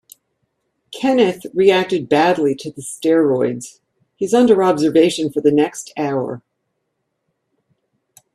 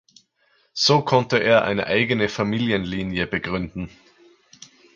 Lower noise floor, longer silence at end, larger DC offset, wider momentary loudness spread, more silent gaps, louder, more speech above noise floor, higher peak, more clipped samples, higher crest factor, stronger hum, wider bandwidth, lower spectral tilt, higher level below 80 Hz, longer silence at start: first, -73 dBFS vs -64 dBFS; first, 1.95 s vs 1.1 s; neither; about the same, 13 LU vs 13 LU; neither; first, -16 LUFS vs -21 LUFS; first, 57 dB vs 43 dB; about the same, 0 dBFS vs -2 dBFS; neither; about the same, 18 dB vs 20 dB; neither; first, 13.5 kHz vs 7.8 kHz; about the same, -5 dB/octave vs -5 dB/octave; second, -62 dBFS vs -50 dBFS; first, 0.9 s vs 0.75 s